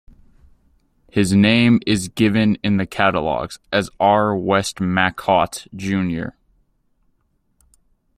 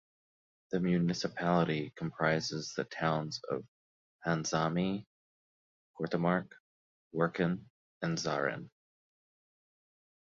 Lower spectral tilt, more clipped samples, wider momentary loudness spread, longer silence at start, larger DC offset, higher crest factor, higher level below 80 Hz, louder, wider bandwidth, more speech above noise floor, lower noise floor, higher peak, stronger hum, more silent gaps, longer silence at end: about the same, -5.5 dB/octave vs -5.5 dB/octave; neither; about the same, 10 LU vs 10 LU; first, 1.15 s vs 0.7 s; neither; about the same, 18 dB vs 20 dB; first, -50 dBFS vs -68 dBFS; first, -18 LUFS vs -34 LUFS; first, 14.5 kHz vs 7.6 kHz; second, 47 dB vs over 57 dB; second, -65 dBFS vs under -90 dBFS; first, -2 dBFS vs -14 dBFS; neither; second, none vs 3.68-4.19 s, 5.07-5.94 s, 6.60-7.11 s, 7.70-8.01 s; first, 1.9 s vs 1.6 s